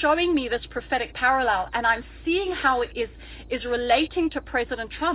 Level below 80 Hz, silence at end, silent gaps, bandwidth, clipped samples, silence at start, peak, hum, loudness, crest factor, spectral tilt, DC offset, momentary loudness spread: -44 dBFS; 0 s; none; 4 kHz; under 0.1%; 0 s; -8 dBFS; none; -24 LUFS; 16 dB; -8 dB/octave; under 0.1%; 9 LU